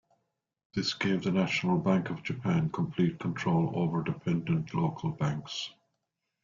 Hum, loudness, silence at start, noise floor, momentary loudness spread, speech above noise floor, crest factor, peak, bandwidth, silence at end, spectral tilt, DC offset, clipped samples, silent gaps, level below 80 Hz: none; -30 LUFS; 0.75 s; -83 dBFS; 7 LU; 54 dB; 18 dB; -14 dBFS; 7.4 kHz; 0.7 s; -6.5 dB/octave; under 0.1%; under 0.1%; none; -62 dBFS